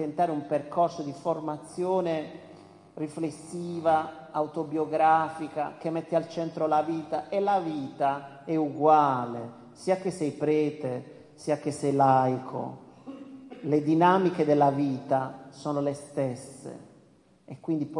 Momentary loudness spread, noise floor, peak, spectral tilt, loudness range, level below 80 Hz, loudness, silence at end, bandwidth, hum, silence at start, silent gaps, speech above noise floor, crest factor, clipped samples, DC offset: 18 LU; -60 dBFS; -8 dBFS; -7 dB/octave; 5 LU; -74 dBFS; -28 LUFS; 0 s; 11.5 kHz; none; 0 s; none; 33 dB; 20 dB; under 0.1%; under 0.1%